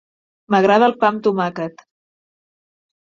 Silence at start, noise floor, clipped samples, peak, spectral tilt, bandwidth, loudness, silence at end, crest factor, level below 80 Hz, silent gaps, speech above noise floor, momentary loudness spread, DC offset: 0.5 s; under -90 dBFS; under 0.1%; -2 dBFS; -6.5 dB/octave; 7.4 kHz; -16 LUFS; 1.35 s; 18 dB; -66 dBFS; none; over 74 dB; 13 LU; under 0.1%